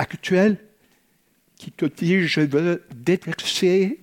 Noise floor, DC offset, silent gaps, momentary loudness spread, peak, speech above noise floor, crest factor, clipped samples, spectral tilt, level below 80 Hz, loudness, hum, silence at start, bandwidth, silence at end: -64 dBFS; under 0.1%; none; 8 LU; -4 dBFS; 43 dB; 18 dB; under 0.1%; -5.5 dB/octave; -64 dBFS; -21 LUFS; none; 0 s; 16.5 kHz; 0.05 s